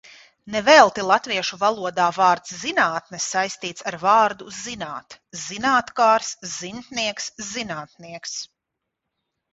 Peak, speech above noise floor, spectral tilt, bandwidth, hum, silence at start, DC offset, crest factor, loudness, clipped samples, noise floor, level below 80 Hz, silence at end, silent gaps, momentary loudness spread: 0 dBFS; 60 dB; -2 dB/octave; 8 kHz; none; 0.45 s; under 0.1%; 22 dB; -21 LUFS; under 0.1%; -82 dBFS; -62 dBFS; 1.05 s; none; 16 LU